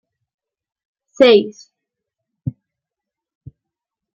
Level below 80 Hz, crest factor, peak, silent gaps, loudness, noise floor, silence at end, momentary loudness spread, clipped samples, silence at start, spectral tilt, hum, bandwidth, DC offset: -60 dBFS; 20 dB; -2 dBFS; none; -13 LUFS; -85 dBFS; 1.65 s; 19 LU; under 0.1%; 1.2 s; -6 dB/octave; none; 7.6 kHz; under 0.1%